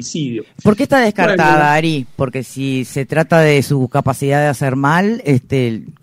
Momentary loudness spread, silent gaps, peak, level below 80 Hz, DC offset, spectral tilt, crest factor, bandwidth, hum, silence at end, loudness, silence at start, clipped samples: 10 LU; none; 0 dBFS; -48 dBFS; under 0.1%; -6 dB/octave; 14 dB; 16 kHz; none; 0.1 s; -14 LUFS; 0 s; under 0.1%